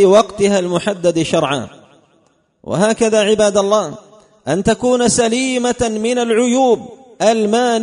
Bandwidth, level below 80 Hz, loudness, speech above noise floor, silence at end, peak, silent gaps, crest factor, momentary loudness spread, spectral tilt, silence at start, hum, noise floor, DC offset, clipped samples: 11 kHz; -46 dBFS; -15 LUFS; 43 dB; 0 s; 0 dBFS; none; 14 dB; 7 LU; -4 dB/octave; 0 s; none; -57 dBFS; under 0.1%; under 0.1%